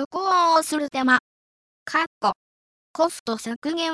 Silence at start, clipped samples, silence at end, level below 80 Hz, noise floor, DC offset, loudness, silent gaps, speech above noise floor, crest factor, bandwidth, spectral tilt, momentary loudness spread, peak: 0 s; under 0.1%; 0 s; -68 dBFS; under -90 dBFS; under 0.1%; -22 LUFS; 0.05-0.11 s, 1.20-1.86 s, 2.07-2.21 s, 2.36-2.94 s, 3.20-3.26 s, 3.56-3.62 s; over 67 dB; 18 dB; 11 kHz; -2.5 dB/octave; 11 LU; -4 dBFS